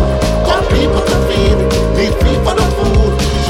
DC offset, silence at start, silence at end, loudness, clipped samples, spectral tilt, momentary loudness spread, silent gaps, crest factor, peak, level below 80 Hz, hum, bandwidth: under 0.1%; 0 s; 0 s; -13 LUFS; under 0.1%; -6 dB/octave; 2 LU; none; 10 dB; 0 dBFS; -16 dBFS; none; 15.5 kHz